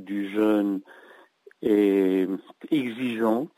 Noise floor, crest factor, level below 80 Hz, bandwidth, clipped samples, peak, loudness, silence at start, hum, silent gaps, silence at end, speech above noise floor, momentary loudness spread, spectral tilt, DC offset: -54 dBFS; 14 dB; -72 dBFS; 16 kHz; under 0.1%; -10 dBFS; -25 LUFS; 0 s; none; none; 0.1 s; 30 dB; 10 LU; -7 dB/octave; under 0.1%